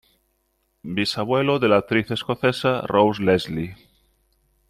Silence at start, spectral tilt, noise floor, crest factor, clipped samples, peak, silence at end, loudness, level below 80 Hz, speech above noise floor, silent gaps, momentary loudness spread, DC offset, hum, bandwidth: 0.85 s; -6 dB/octave; -70 dBFS; 20 dB; under 0.1%; -4 dBFS; 0.95 s; -21 LUFS; -56 dBFS; 49 dB; none; 11 LU; under 0.1%; none; 15 kHz